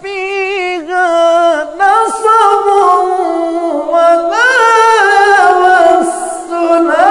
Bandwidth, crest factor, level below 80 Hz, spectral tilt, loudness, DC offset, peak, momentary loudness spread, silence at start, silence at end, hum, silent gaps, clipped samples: 11 kHz; 10 dB; -52 dBFS; -1.5 dB/octave; -9 LUFS; under 0.1%; 0 dBFS; 9 LU; 0 s; 0 s; none; none; 0.9%